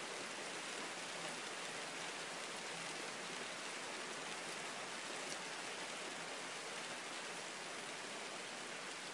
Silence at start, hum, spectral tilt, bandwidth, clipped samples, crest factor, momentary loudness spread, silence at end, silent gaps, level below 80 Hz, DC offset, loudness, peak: 0 s; none; -1 dB/octave; 12 kHz; under 0.1%; 18 dB; 2 LU; 0 s; none; under -90 dBFS; under 0.1%; -45 LUFS; -28 dBFS